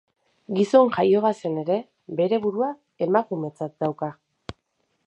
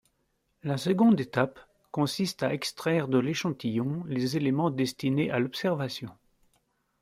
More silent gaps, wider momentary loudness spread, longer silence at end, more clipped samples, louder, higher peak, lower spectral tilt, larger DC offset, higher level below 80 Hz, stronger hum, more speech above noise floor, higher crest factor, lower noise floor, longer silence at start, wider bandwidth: neither; first, 15 LU vs 9 LU; second, 0.55 s vs 0.9 s; neither; first, -23 LUFS vs -28 LUFS; first, -4 dBFS vs -8 dBFS; first, -7.5 dB/octave vs -6 dB/octave; neither; first, -62 dBFS vs -68 dBFS; neither; first, 51 dB vs 47 dB; about the same, 20 dB vs 20 dB; about the same, -73 dBFS vs -75 dBFS; second, 0.5 s vs 0.65 s; second, 8.6 kHz vs 15.5 kHz